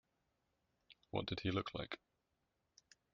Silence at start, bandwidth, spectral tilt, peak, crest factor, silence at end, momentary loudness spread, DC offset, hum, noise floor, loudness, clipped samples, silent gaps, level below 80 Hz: 0.9 s; 7.2 kHz; -4.5 dB/octave; -22 dBFS; 24 dB; 1.15 s; 9 LU; under 0.1%; none; -85 dBFS; -44 LUFS; under 0.1%; none; -68 dBFS